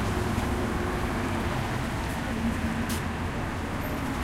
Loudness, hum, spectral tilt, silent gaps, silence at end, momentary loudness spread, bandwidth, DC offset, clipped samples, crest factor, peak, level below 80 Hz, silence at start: -30 LUFS; none; -5.5 dB/octave; none; 0 s; 3 LU; 16 kHz; under 0.1%; under 0.1%; 14 dB; -14 dBFS; -36 dBFS; 0 s